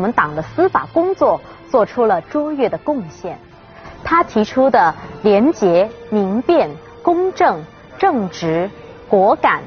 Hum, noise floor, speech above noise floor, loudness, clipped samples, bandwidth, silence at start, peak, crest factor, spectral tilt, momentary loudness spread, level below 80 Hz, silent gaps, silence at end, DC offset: none; -38 dBFS; 22 dB; -16 LUFS; under 0.1%; 6.8 kHz; 0 s; 0 dBFS; 16 dB; -5 dB/octave; 10 LU; -48 dBFS; none; 0 s; under 0.1%